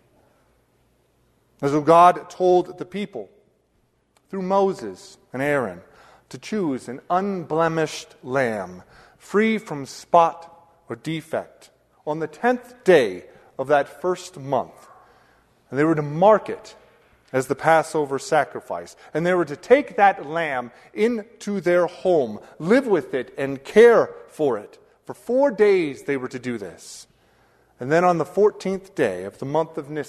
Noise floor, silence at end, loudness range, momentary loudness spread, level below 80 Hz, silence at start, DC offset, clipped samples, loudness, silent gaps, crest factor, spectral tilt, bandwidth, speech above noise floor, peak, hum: -66 dBFS; 0 s; 6 LU; 17 LU; -64 dBFS; 1.6 s; under 0.1%; under 0.1%; -21 LUFS; none; 20 dB; -6 dB/octave; 13.5 kHz; 44 dB; -2 dBFS; none